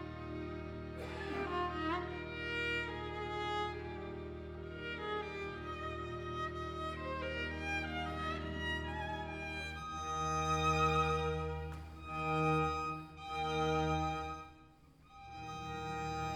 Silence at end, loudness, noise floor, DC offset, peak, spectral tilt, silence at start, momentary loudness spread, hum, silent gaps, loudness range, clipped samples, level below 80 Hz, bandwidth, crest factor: 0 s; -39 LUFS; -62 dBFS; under 0.1%; -20 dBFS; -5.5 dB/octave; 0 s; 12 LU; none; none; 6 LU; under 0.1%; -52 dBFS; 17 kHz; 18 dB